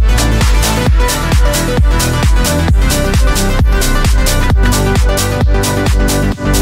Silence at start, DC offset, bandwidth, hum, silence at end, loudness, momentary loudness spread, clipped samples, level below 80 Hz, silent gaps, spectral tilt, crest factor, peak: 0 s; under 0.1%; 16.5 kHz; none; 0 s; -12 LUFS; 1 LU; under 0.1%; -12 dBFS; none; -4.5 dB/octave; 10 dB; 0 dBFS